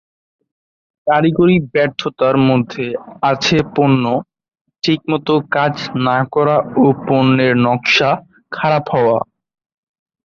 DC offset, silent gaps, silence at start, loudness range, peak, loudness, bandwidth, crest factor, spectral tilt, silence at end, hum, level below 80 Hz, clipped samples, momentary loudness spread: under 0.1%; 4.61-4.65 s; 1.05 s; 2 LU; -2 dBFS; -15 LUFS; 7.4 kHz; 14 dB; -6.5 dB/octave; 1 s; none; -52 dBFS; under 0.1%; 9 LU